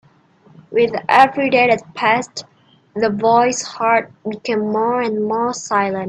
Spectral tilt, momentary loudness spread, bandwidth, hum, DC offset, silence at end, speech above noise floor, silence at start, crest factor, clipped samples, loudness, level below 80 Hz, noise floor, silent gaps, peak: -4 dB/octave; 10 LU; 10.5 kHz; none; under 0.1%; 0 s; 34 dB; 0.7 s; 18 dB; under 0.1%; -17 LUFS; -62 dBFS; -51 dBFS; none; 0 dBFS